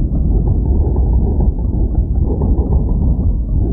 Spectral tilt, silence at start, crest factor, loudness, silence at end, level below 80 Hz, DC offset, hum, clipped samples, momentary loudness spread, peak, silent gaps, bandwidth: -15.5 dB/octave; 0 s; 10 dB; -16 LUFS; 0 s; -14 dBFS; under 0.1%; none; under 0.1%; 2 LU; -2 dBFS; none; 1.2 kHz